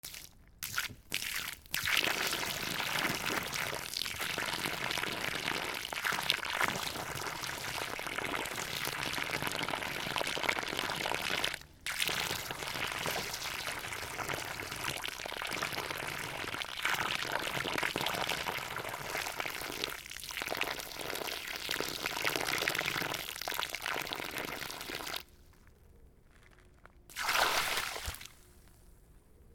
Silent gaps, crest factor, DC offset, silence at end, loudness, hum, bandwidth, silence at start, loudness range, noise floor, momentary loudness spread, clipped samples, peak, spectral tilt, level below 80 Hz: none; 32 dB; under 0.1%; 0 s; -35 LUFS; none; over 20 kHz; 0.05 s; 4 LU; -60 dBFS; 7 LU; under 0.1%; -6 dBFS; -1.5 dB/octave; -60 dBFS